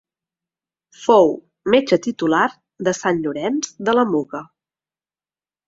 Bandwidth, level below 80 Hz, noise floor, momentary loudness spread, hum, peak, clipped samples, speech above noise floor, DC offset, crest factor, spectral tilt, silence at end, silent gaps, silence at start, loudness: 7.8 kHz; -62 dBFS; under -90 dBFS; 11 LU; none; 0 dBFS; under 0.1%; over 72 dB; under 0.1%; 20 dB; -4.5 dB/octave; 1.25 s; none; 1 s; -19 LUFS